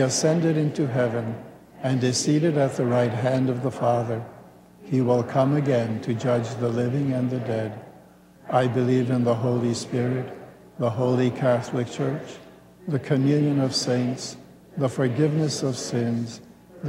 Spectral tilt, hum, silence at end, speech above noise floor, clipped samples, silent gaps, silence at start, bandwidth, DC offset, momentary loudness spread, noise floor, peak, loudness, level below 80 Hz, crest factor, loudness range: -6 dB/octave; none; 0 s; 27 dB; under 0.1%; none; 0 s; 13 kHz; under 0.1%; 12 LU; -50 dBFS; -8 dBFS; -24 LUFS; -64 dBFS; 16 dB; 2 LU